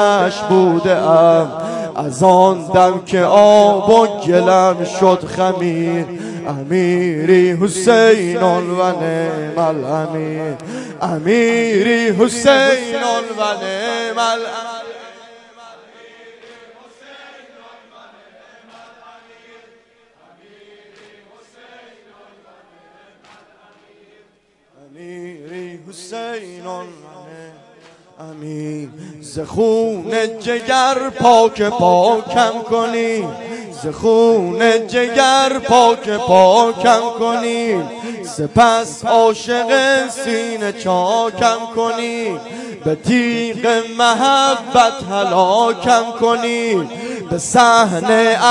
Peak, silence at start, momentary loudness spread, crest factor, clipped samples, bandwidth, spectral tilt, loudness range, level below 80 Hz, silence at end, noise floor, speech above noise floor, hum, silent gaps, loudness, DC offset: 0 dBFS; 0 s; 16 LU; 16 dB; under 0.1%; 11.5 kHz; -4.5 dB/octave; 17 LU; -56 dBFS; 0 s; -56 dBFS; 42 dB; none; none; -14 LUFS; under 0.1%